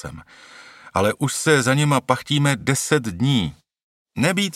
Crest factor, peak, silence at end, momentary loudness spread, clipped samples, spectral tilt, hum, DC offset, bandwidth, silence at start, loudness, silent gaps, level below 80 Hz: 20 dB; 0 dBFS; 0.05 s; 8 LU; under 0.1%; -4.5 dB/octave; none; under 0.1%; 15.5 kHz; 0.05 s; -20 LUFS; 3.83-4.05 s; -52 dBFS